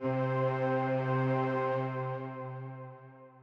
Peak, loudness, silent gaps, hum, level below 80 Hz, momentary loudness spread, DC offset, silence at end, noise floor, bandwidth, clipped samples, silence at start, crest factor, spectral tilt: -20 dBFS; -32 LUFS; none; none; -74 dBFS; 15 LU; under 0.1%; 0 s; -53 dBFS; 5.4 kHz; under 0.1%; 0 s; 14 dB; -9.5 dB/octave